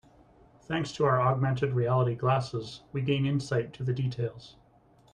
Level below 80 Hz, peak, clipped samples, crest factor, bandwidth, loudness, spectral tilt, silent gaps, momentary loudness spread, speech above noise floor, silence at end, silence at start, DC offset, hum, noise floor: -60 dBFS; -12 dBFS; under 0.1%; 18 dB; 9.6 kHz; -29 LUFS; -7 dB/octave; none; 11 LU; 33 dB; 0.6 s; 0.7 s; under 0.1%; none; -61 dBFS